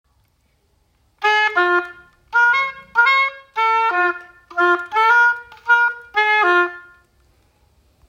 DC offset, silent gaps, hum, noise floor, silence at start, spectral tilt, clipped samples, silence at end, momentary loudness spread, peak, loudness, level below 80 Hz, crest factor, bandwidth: under 0.1%; none; none; -62 dBFS; 1.2 s; -2 dB/octave; under 0.1%; 1.3 s; 8 LU; -4 dBFS; -16 LUFS; -62 dBFS; 16 dB; 15.5 kHz